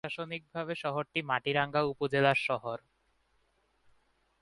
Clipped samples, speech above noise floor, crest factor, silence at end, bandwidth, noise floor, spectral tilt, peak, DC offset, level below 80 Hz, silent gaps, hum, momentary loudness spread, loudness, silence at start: under 0.1%; 41 dB; 22 dB; 1.65 s; 11.5 kHz; -73 dBFS; -6 dB/octave; -12 dBFS; under 0.1%; -70 dBFS; none; none; 11 LU; -31 LUFS; 0.05 s